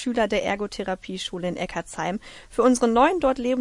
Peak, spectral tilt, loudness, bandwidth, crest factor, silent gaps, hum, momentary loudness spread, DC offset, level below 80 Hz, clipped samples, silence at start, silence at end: -6 dBFS; -4.5 dB/octave; -24 LUFS; 11.5 kHz; 18 dB; none; none; 11 LU; under 0.1%; -48 dBFS; under 0.1%; 0 s; 0 s